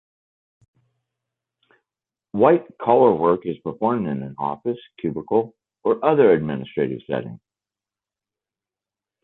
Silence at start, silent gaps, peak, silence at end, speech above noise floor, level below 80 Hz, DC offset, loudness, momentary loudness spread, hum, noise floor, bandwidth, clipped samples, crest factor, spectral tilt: 2.35 s; none; -2 dBFS; 1.9 s; 70 dB; -60 dBFS; under 0.1%; -21 LUFS; 13 LU; none; -90 dBFS; 4.1 kHz; under 0.1%; 20 dB; -10.5 dB/octave